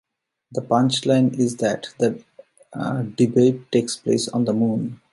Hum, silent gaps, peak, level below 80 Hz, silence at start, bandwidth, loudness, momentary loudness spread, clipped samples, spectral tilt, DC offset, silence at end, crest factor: none; none; -4 dBFS; -64 dBFS; 0.5 s; 11.5 kHz; -21 LUFS; 11 LU; under 0.1%; -6 dB/octave; under 0.1%; 0.2 s; 16 dB